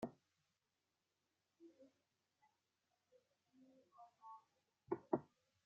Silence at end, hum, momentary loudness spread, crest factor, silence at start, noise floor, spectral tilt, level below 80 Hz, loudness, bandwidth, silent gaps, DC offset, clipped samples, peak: 0.4 s; none; 23 LU; 32 dB; 0 s; under -90 dBFS; -8 dB/octave; under -90 dBFS; -47 LUFS; 7.2 kHz; none; under 0.1%; under 0.1%; -24 dBFS